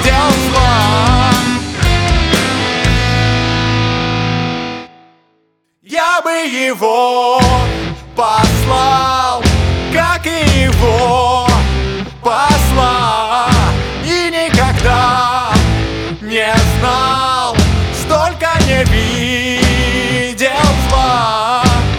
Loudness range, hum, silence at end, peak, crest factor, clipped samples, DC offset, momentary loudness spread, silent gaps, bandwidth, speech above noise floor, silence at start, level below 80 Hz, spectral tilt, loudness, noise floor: 3 LU; none; 0 s; 0 dBFS; 12 dB; under 0.1%; under 0.1%; 5 LU; none; 18 kHz; 49 dB; 0 s; -20 dBFS; -4.5 dB/octave; -12 LUFS; -60 dBFS